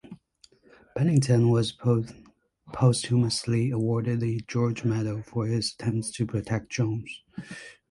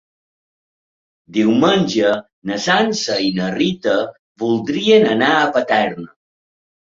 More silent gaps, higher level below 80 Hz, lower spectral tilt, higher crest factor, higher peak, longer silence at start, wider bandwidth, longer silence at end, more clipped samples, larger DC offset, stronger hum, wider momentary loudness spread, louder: second, none vs 2.33-2.42 s, 4.19-4.35 s; about the same, -56 dBFS vs -58 dBFS; first, -6 dB/octave vs -4.5 dB/octave; about the same, 18 dB vs 16 dB; second, -8 dBFS vs -2 dBFS; second, 0.1 s vs 1.3 s; first, 11.5 kHz vs 7.8 kHz; second, 0.2 s vs 0.85 s; neither; neither; neither; first, 18 LU vs 11 LU; second, -26 LUFS vs -16 LUFS